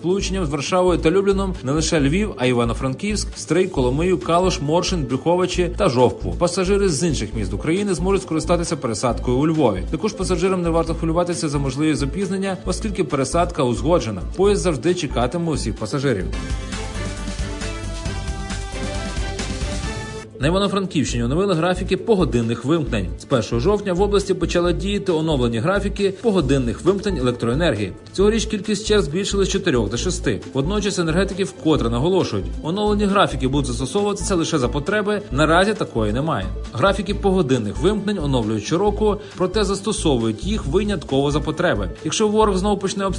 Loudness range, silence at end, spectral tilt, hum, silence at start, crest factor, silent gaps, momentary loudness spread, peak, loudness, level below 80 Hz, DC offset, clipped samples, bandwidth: 3 LU; 0 s; -5.5 dB/octave; none; 0 s; 16 dB; none; 8 LU; -2 dBFS; -20 LUFS; -30 dBFS; under 0.1%; under 0.1%; 11 kHz